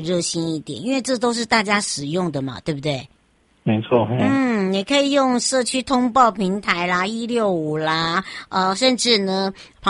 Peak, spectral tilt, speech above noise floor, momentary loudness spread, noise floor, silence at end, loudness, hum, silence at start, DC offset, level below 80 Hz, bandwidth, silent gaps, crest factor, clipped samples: -2 dBFS; -4 dB/octave; 40 dB; 9 LU; -59 dBFS; 0 s; -20 LUFS; none; 0 s; under 0.1%; -54 dBFS; 11.5 kHz; none; 18 dB; under 0.1%